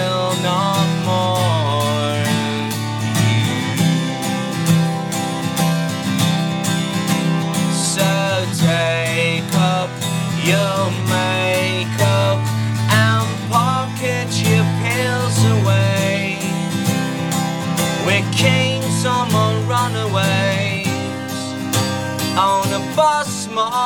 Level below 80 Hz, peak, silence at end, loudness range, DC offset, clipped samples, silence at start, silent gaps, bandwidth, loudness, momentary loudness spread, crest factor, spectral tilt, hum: -56 dBFS; 0 dBFS; 0 s; 2 LU; 0.1%; under 0.1%; 0 s; none; 19 kHz; -17 LUFS; 5 LU; 16 dB; -5 dB/octave; none